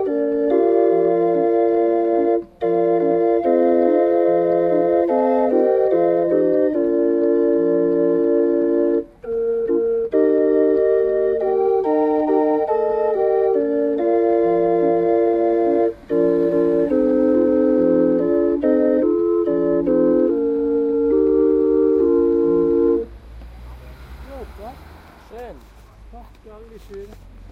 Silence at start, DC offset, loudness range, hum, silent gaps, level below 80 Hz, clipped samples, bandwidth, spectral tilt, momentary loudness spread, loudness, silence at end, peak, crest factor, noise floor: 0 s; under 0.1%; 1 LU; none; none; -46 dBFS; under 0.1%; 4.3 kHz; -9.5 dB/octave; 5 LU; -18 LUFS; 0.05 s; -4 dBFS; 14 dB; -43 dBFS